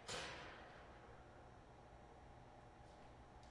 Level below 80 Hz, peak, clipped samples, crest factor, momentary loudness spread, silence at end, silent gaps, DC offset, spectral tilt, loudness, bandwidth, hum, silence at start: -68 dBFS; -36 dBFS; under 0.1%; 22 dB; 12 LU; 0 s; none; under 0.1%; -3 dB/octave; -58 LUFS; 12 kHz; none; 0 s